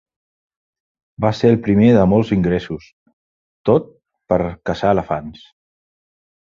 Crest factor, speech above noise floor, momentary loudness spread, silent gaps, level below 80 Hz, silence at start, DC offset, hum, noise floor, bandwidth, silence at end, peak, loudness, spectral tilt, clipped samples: 18 dB; over 74 dB; 13 LU; 2.93-3.06 s, 3.13-3.64 s; -42 dBFS; 1.2 s; under 0.1%; none; under -90 dBFS; 7.2 kHz; 1.25 s; -2 dBFS; -17 LUFS; -8.5 dB/octave; under 0.1%